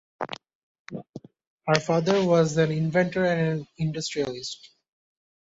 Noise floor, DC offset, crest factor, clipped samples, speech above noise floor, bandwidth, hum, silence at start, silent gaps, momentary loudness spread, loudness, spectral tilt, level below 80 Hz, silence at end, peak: -44 dBFS; under 0.1%; 24 dB; under 0.1%; 20 dB; 8 kHz; none; 0.2 s; 0.55-0.85 s, 1.09-1.13 s, 1.47-1.58 s; 19 LU; -25 LUFS; -5.5 dB/octave; -62 dBFS; 0.9 s; -4 dBFS